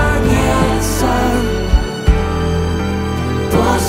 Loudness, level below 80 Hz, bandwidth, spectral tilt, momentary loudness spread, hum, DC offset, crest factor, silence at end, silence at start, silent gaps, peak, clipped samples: -16 LUFS; -20 dBFS; 16.5 kHz; -5.5 dB/octave; 5 LU; none; under 0.1%; 14 dB; 0 s; 0 s; none; 0 dBFS; under 0.1%